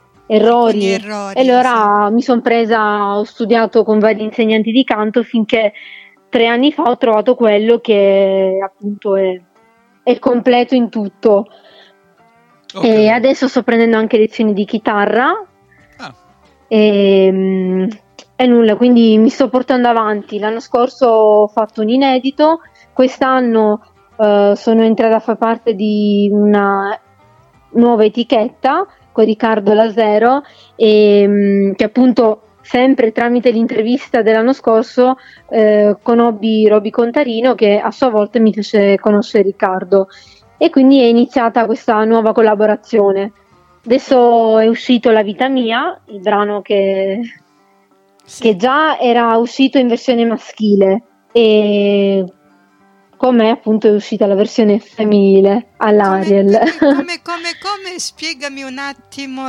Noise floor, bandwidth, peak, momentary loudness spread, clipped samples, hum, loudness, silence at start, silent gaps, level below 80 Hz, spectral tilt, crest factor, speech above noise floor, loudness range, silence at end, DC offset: -52 dBFS; 10.5 kHz; 0 dBFS; 9 LU; under 0.1%; none; -12 LUFS; 0.3 s; none; -58 dBFS; -6 dB/octave; 12 dB; 41 dB; 3 LU; 0 s; under 0.1%